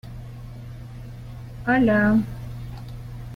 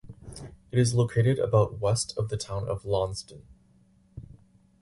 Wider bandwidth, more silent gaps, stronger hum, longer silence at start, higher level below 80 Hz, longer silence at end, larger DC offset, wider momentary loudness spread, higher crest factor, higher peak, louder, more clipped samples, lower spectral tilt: first, 15 kHz vs 11.5 kHz; neither; neither; about the same, 0.05 s vs 0.1 s; first, -42 dBFS vs -50 dBFS; second, 0 s vs 0.6 s; neither; about the same, 21 LU vs 22 LU; about the same, 16 dB vs 20 dB; about the same, -10 dBFS vs -8 dBFS; first, -21 LUFS vs -27 LUFS; neither; first, -8.5 dB/octave vs -6 dB/octave